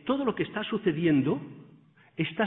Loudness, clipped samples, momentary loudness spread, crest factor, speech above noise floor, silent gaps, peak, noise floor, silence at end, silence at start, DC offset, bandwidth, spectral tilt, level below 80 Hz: -28 LUFS; under 0.1%; 13 LU; 16 dB; 30 dB; none; -12 dBFS; -57 dBFS; 0 s; 0.05 s; under 0.1%; 4 kHz; -10.5 dB/octave; -64 dBFS